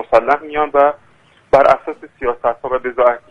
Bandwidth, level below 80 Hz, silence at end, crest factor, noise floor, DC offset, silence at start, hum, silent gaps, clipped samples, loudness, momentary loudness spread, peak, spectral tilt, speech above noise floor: 8.6 kHz; -44 dBFS; 0.1 s; 16 dB; -50 dBFS; under 0.1%; 0 s; none; none; under 0.1%; -15 LUFS; 11 LU; 0 dBFS; -6 dB/octave; 36 dB